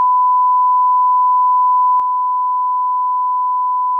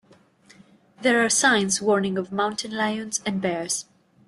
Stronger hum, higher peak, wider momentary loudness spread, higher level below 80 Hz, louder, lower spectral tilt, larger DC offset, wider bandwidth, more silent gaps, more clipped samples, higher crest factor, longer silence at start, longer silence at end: first, 50 Hz at -90 dBFS vs none; second, -10 dBFS vs -6 dBFS; second, 4 LU vs 9 LU; second, -78 dBFS vs -66 dBFS; first, -14 LUFS vs -23 LUFS; about the same, -4 dB/octave vs -3 dB/octave; neither; second, 1.4 kHz vs 12.5 kHz; neither; neither; second, 4 dB vs 18 dB; second, 0 s vs 1 s; second, 0 s vs 0.45 s